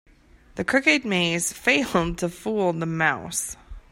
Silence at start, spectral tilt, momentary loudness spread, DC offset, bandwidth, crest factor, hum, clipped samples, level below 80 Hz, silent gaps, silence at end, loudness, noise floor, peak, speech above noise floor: 0.55 s; -3.5 dB/octave; 11 LU; under 0.1%; 16 kHz; 20 dB; none; under 0.1%; -46 dBFS; none; 0.1 s; -23 LUFS; -53 dBFS; -4 dBFS; 30 dB